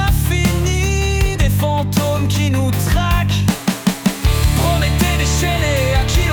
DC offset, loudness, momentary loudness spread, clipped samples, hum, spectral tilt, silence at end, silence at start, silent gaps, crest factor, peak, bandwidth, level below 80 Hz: under 0.1%; -16 LUFS; 2 LU; under 0.1%; none; -5 dB/octave; 0 s; 0 s; none; 12 dB; -4 dBFS; 19.5 kHz; -20 dBFS